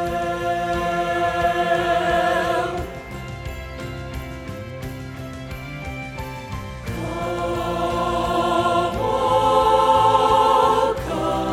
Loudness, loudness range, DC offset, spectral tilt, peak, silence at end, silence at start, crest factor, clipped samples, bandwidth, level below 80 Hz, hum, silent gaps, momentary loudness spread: -20 LUFS; 14 LU; under 0.1%; -5.5 dB/octave; -4 dBFS; 0 s; 0 s; 18 dB; under 0.1%; 19 kHz; -38 dBFS; none; none; 17 LU